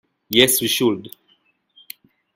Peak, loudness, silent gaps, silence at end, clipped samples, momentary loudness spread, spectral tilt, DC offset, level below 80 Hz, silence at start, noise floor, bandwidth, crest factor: 0 dBFS; -17 LUFS; none; 1.25 s; under 0.1%; 25 LU; -2.5 dB/octave; under 0.1%; -56 dBFS; 0.3 s; -62 dBFS; 16.5 kHz; 22 dB